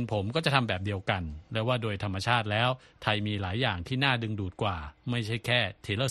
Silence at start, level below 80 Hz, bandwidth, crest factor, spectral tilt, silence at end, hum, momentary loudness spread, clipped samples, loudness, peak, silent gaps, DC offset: 0 s; -52 dBFS; 12 kHz; 22 dB; -5.5 dB/octave; 0 s; none; 7 LU; under 0.1%; -29 LUFS; -8 dBFS; none; under 0.1%